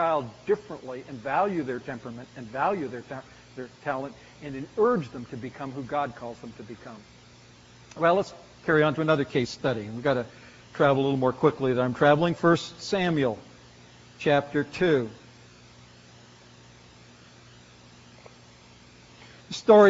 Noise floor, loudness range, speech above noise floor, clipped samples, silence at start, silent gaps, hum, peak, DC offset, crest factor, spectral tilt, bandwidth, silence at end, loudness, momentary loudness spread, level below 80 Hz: -52 dBFS; 8 LU; 26 dB; under 0.1%; 0 s; none; none; -4 dBFS; under 0.1%; 22 dB; -5 dB/octave; 7.6 kHz; 0 s; -26 LUFS; 19 LU; -62 dBFS